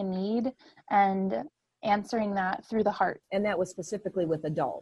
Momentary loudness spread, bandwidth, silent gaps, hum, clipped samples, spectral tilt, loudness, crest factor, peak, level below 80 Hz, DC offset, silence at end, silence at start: 9 LU; 11.5 kHz; none; none; under 0.1%; -6.5 dB/octave; -30 LUFS; 18 dB; -12 dBFS; -66 dBFS; under 0.1%; 0 s; 0 s